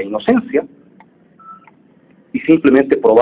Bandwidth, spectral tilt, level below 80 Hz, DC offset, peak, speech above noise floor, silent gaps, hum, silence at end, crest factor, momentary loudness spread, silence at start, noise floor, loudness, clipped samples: 4 kHz; -10.5 dB/octave; -54 dBFS; under 0.1%; 0 dBFS; 37 dB; none; none; 0 s; 16 dB; 11 LU; 0 s; -49 dBFS; -14 LUFS; under 0.1%